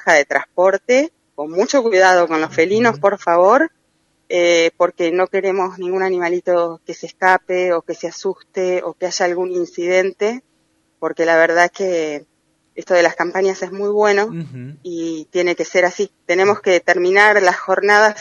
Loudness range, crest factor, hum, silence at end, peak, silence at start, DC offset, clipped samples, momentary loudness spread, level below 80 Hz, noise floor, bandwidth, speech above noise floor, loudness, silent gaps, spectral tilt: 4 LU; 16 dB; none; 0 s; 0 dBFS; 0.05 s; under 0.1%; under 0.1%; 13 LU; -68 dBFS; -63 dBFS; 10 kHz; 47 dB; -16 LUFS; none; -4 dB/octave